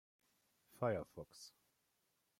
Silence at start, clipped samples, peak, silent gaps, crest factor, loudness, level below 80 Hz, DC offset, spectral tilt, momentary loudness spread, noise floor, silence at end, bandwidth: 0.75 s; under 0.1%; -26 dBFS; none; 22 dB; -44 LUFS; -78 dBFS; under 0.1%; -6 dB/octave; 18 LU; -83 dBFS; 0.9 s; 16.5 kHz